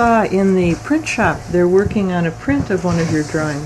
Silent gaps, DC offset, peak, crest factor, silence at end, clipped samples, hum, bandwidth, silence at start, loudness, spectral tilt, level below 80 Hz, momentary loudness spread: none; under 0.1%; -2 dBFS; 12 dB; 0 s; under 0.1%; none; 12.5 kHz; 0 s; -16 LUFS; -6.5 dB/octave; -36 dBFS; 5 LU